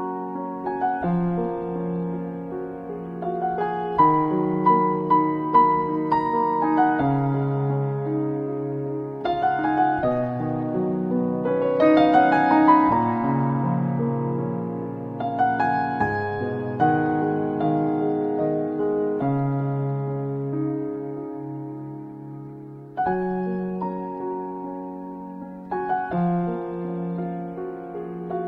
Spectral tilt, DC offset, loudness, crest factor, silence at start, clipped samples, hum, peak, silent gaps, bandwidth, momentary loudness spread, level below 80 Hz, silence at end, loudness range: -10 dB/octave; under 0.1%; -23 LUFS; 20 dB; 0 s; under 0.1%; none; -4 dBFS; none; 5.4 kHz; 14 LU; -56 dBFS; 0 s; 10 LU